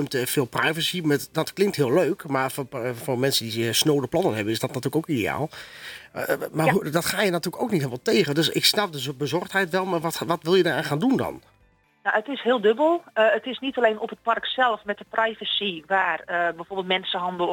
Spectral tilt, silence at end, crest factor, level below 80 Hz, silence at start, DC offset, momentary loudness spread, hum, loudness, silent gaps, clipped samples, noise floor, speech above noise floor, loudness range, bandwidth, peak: -4 dB/octave; 0 s; 20 dB; -62 dBFS; 0 s; under 0.1%; 8 LU; none; -24 LUFS; none; under 0.1%; -61 dBFS; 37 dB; 2 LU; 19 kHz; -4 dBFS